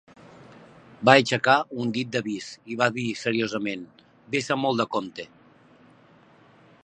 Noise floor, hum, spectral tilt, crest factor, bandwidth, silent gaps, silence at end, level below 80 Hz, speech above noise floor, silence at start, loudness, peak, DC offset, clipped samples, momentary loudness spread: -55 dBFS; none; -4.5 dB/octave; 26 dB; 10 kHz; none; 1.6 s; -70 dBFS; 31 dB; 0.5 s; -24 LUFS; 0 dBFS; under 0.1%; under 0.1%; 17 LU